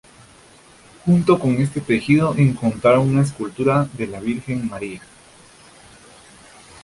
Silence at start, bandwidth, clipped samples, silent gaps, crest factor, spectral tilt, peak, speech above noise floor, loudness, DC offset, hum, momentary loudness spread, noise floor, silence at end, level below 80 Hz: 1.05 s; 11.5 kHz; under 0.1%; none; 18 dB; -7.5 dB/octave; -2 dBFS; 30 dB; -19 LUFS; under 0.1%; none; 11 LU; -48 dBFS; 1.85 s; -50 dBFS